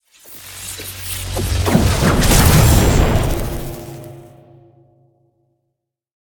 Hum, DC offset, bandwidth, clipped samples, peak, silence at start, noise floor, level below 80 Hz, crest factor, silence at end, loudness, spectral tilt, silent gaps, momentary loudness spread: none; under 0.1%; 19.5 kHz; under 0.1%; 0 dBFS; 0.3 s; -76 dBFS; -22 dBFS; 18 dB; 2 s; -15 LUFS; -5 dB/octave; none; 22 LU